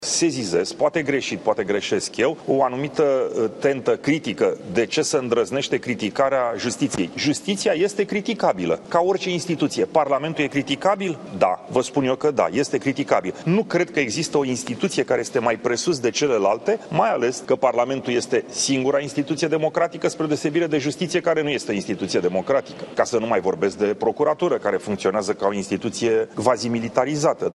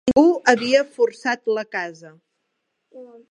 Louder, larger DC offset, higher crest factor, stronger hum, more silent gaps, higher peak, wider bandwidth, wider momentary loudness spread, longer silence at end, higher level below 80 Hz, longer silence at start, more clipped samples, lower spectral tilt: second, -22 LUFS vs -19 LUFS; neither; about the same, 20 dB vs 20 dB; neither; neither; about the same, -2 dBFS vs 0 dBFS; first, 12 kHz vs 10 kHz; second, 3 LU vs 13 LU; second, 0.05 s vs 0.25 s; about the same, -62 dBFS vs -58 dBFS; about the same, 0 s vs 0.05 s; neither; about the same, -4.5 dB/octave vs -4 dB/octave